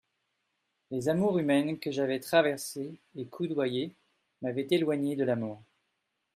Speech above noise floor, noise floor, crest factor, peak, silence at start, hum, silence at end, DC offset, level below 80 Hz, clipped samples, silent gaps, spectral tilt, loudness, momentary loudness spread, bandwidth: 51 dB; -81 dBFS; 18 dB; -12 dBFS; 0.9 s; none; 0.75 s; under 0.1%; -74 dBFS; under 0.1%; none; -5.5 dB/octave; -30 LUFS; 14 LU; 15 kHz